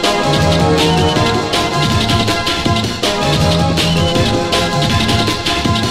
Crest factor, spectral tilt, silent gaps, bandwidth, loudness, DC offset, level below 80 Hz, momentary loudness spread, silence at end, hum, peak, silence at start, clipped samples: 12 dB; -4.5 dB/octave; none; 16 kHz; -13 LUFS; under 0.1%; -28 dBFS; 3 LU; 0 s; none; -2 dBFS; 0 s; under 0.1%